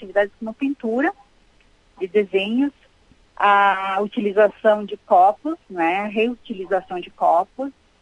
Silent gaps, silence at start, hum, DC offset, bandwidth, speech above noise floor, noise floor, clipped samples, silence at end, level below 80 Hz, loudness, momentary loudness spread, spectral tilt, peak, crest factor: none; 0 s; none; under 0.1%; 10.5 kHz; 36 dB; -56 dBFS; under 0.1%; 0.3 s; -60 dBFS; -20 LUFS; 13 LU; -6.5 dB/octave; -4 dBFS; 16 dB